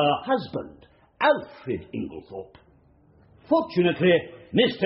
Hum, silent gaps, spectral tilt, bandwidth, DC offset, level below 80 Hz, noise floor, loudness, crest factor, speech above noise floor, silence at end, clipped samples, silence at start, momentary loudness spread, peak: none; none; -4 dB/octave; 5.8 kHz; under 0.1%; -60 dBFS; -58 dBFS; -25 LUFS; 18 dB; 33 dB; 0 s; under 0.1%; 0 s; 16 LU; -8 dBFS